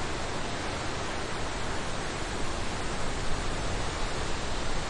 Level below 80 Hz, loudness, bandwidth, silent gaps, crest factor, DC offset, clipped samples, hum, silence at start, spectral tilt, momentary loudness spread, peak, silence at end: -36 dBFS; -33 LUFS; 11 kHz; none; 14 dB; under 0.1%; under 0.1%; none; 0 s; -3.5 dB/octave; 1 LU; -16 dBFS; 0 s